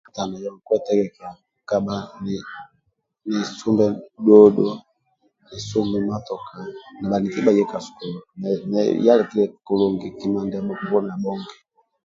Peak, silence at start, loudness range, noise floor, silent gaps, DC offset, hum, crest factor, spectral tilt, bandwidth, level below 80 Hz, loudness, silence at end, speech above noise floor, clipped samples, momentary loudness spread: 0 dBFS; 0.15 s; 7 LU; -70 dBFS; none; under 0.1%; none; 20 dB; -7 dB/octave; 7.6 kHz; -58 dBFS; -21 LUFS; 0.5 s; 50 dB; under 0.1%; 18 LU